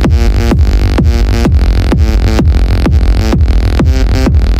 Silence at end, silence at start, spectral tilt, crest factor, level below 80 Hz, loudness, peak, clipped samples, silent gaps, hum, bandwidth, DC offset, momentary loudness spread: 0 s; 0 s; -7 dB/octave; 8 dB; -8 dBFS; -10 LUFS; 0 dBFS; under 0.1%; none; none; 11 kHz; 0.8%; 1 LU